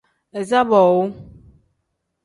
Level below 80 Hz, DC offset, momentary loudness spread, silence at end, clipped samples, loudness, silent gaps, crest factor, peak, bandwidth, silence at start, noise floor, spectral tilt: -56 dBFS; under 0.1%; 16 LU; 1 s; under 0.1%; -17 LUFS; none; 18 dB; -2 dBFS; 11.5 kHz; 0.35 s; -74 dBFS; -6.5 dB/octave